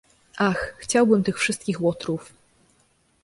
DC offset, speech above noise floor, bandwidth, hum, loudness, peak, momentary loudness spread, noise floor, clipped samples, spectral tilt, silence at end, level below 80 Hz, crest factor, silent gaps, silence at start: under 0.1%; 41 dB; 11.5 kHz; none; -23 LUFS; -6 dBFS; 11 LU; -64 dBFS; under 0.1%; -5 dB/octave; 1 s; -56 dBFS; 18 dB; none; 0.35 s